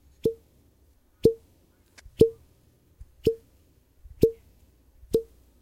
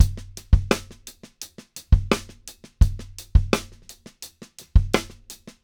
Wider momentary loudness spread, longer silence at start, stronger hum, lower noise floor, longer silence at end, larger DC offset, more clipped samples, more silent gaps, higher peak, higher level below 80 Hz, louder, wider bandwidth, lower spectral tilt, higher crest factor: about the same, 23 LU vs 22 LU; first, 0.25 s vs 0 s; neither; first, -62 dBFS vs -47 dBFS; about the same, 0.4 s vs 0.3 s; neither; neither; neither; about the same, -2 dBFS vs 0 dBFS; second, -50 dBFS vs -26 dBFS; second, -27 LUFS vs -23 LUFS; second, 16.5 kHz vs over 20 kHz; first, -7.5 dB/octave vs -5.5 dB/octave; about the same, 26 dB vs 22 dB